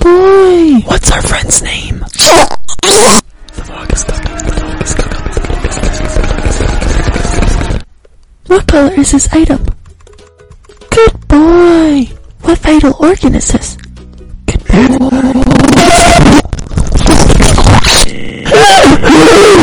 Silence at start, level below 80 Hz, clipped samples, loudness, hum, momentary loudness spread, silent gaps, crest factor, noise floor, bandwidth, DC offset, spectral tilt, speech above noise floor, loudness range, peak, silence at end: 0 s; -14 dBFS; 2%; -7 LUFS; none; 14 LU; none; 6 dB; -39 dBFS; over 20 kHz; under 0.1%; -4 dB/octave; 32 dB; 8 LU; 0 dBFS; 0 s